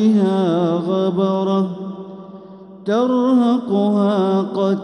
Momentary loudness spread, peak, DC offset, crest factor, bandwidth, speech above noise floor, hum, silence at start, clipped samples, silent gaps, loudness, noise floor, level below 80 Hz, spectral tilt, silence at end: 15 LU; -6 dBFS; under 0.1%; 12 dB; 9.4 kHz; 22 dB; none; 0 s; under 0.1%; none; -17 LUFS; -38 dBFS; -68 dBFS; -8.5 dB/octave; 0 s